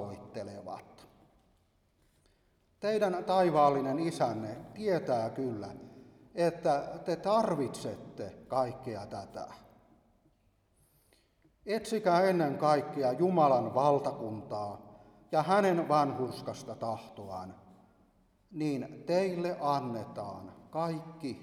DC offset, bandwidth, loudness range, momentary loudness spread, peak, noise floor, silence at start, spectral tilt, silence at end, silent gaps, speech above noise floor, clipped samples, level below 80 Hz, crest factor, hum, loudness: under 0.1%; 15 kHz; 10 LU; 17 LU; -14 dBFS; -71 dBFS; 0 s; -6.5 dB/octave; 0 s; none; 39 dB; under 0.1%; -70 dBFS; 20 dB; none; -32 LUFS